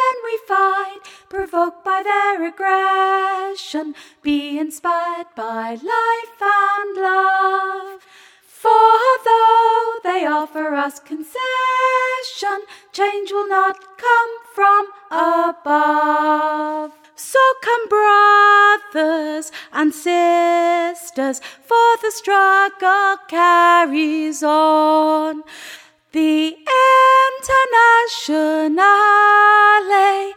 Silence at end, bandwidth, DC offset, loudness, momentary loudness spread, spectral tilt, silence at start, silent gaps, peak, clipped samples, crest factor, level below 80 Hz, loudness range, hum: 0 s; 17 kHz; under 0.1%; -15 LUFS; 15 LU; -2 dB/octave; 0 s; none; -2 dBFS; under 0.1%; 14 dB; -60 dBFS; 6 LU; none